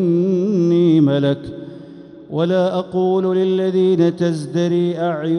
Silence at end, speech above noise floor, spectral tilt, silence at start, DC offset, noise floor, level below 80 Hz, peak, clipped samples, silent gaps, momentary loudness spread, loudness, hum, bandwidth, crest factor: 0 s; 21 dB; -8 dB/octave; 0 s; under 0.1%; -38 dBFS; -58 dBFS; -4 dBFS; under 0.1%; none; 12 LU; -17 LUFS; none; 10.5 kHz; 14 dB